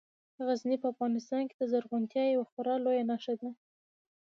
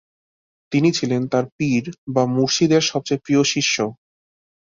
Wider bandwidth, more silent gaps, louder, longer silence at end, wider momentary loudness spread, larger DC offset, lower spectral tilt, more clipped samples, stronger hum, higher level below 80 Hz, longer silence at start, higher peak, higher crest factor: about the same, 7.2 kHz vs 7.6 kHz; second, 1.54-1.59 s, 2.52-2.57 s vs 1.52-1.59 s, 1.98-2.07 s; second, -33 LUFS vs -19 LUFS; about the same, 0.75 s vs 0.75 s; about the same, 7 LU vs 7 LU; neither; first, -6 dB/octave vs -4.5 dB/octave; neither; neither; second, -88 dBFS vs -60 dBFS; second, 0.4 s vs 0.7 s; second, -18 dBFS vs -4 dBFS; about the same, 14 dB vs 18 dB